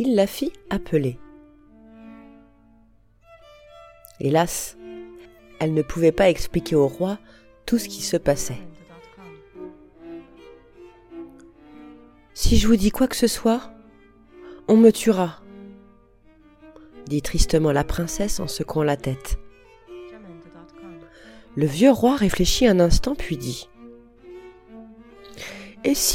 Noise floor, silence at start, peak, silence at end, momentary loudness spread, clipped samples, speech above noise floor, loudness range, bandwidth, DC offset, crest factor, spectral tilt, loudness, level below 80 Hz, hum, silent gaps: -55 dBFS; 0 s; -2 dBFS; 0 s; 26 LU; under 0.1%; 36 dB; 10 LU; 16.5 kHz; under 0.1%; 22 dB; -5 dB/octave; -21 LUFS; -34 dBFS; none; none